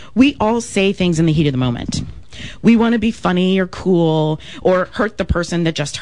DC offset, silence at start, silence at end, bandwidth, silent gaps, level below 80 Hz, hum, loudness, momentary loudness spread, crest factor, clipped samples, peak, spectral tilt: 1%; 0 s; 0 s; 11 kHz; none; -36 dBFS; none; -16 LUFS; 8 LU; 16 dB; under 0.1%; 0 dBFS; -6 dB/octave